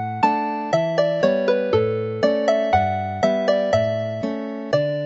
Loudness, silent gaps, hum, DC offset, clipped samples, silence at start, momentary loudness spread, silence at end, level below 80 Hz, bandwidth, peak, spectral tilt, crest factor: -21 LUFS; none; none; under 0.1%; under 0.1%; 0 s; 5 LU; 0 s; -52 dBFS; 7.8 kHz; -4 dBFS; -6.5 dB/octave; 16 dB